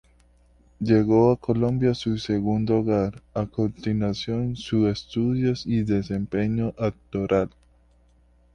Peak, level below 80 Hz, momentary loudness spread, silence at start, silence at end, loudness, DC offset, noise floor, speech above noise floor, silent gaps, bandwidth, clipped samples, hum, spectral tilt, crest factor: -6 dBFS; -48 dBFS; 8 LU; 0.8 s; 1.05 s; -24 LUFS; under 0.1%; -58 dBFS; 35 dB; none; 9.4 kHz; under 0.1%; none; -8 dB/octave; 18 dB